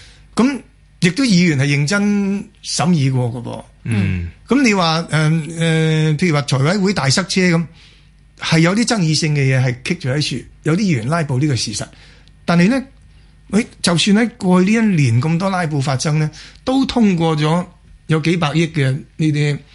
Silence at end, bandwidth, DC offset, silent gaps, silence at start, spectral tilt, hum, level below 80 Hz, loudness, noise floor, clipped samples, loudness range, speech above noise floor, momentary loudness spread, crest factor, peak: 0.15 s; 11.5 kHz; under 0.1%; none; 0 s; -5.5 dB/octave; none; -46 dBFS; -16 LUFS; -47 dBFS; under 0.1%; 3 LU; 31 dB; 9 LU; 16 dB; -2 dBFS